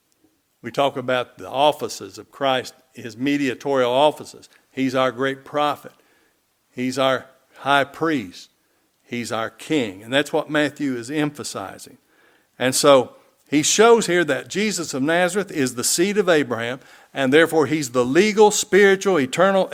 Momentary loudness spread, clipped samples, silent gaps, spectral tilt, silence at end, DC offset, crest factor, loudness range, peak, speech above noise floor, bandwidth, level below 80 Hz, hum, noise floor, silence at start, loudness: 17 LU; under 0.1%; none; -3.5 dB/octave; 0 s; under 0.1%; 20 dB; 7 LU; 0 dBFS; 45 dB; 17 kHz; -66 dBFS; none; -65 dBFS; 0.65 s; -20 LUFS